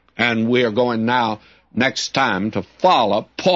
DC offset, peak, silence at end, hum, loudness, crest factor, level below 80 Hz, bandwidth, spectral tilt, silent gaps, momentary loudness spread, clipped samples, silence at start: under 0.1%; -2 dBFS; 0 s; none; -18 LUFS; 16 dB; -58 dBFS; 7.8 kHz; -4.5 dB/octave; none; 7 LU; under 0.1%; 0.2 s